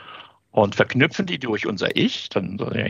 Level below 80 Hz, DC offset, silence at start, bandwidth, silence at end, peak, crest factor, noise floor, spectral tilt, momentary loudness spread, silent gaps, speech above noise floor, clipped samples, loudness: -64 dBFS; under 0.1%; 0 s; 11.5 kHz; 0 s; -2 dBFS; 22 dB; -44 dBFS; -5.5 dB/octave; 8 LU; none; 22 dB; under 0.1%; -22 LUFS